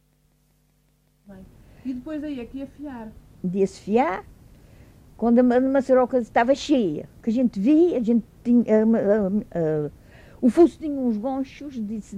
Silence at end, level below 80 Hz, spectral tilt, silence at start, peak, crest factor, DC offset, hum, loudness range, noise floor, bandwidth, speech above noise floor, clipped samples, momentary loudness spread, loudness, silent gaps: 0 s; -52 dBFS; -7.5 dB/octave; 1.3 s; -6 dBFS; 16 dB; under 0.1%; none; 11 LU; -63 dBFS; 9.8 kHz; 42 dB; under 0.1%; 16 LU; -22 LUFS; none